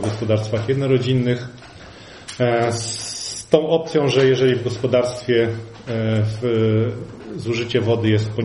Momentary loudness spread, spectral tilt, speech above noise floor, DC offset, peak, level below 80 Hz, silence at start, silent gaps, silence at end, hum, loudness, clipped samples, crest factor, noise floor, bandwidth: 16 LU; -6 dB/octave; 21 dB; under 0.1%; 0 dBFS; -52 dBFS; 0 s; none; 0 s; none; -20 LUFS; under 0.1%; 20 dB; -40 dBFS; 11.5 kHz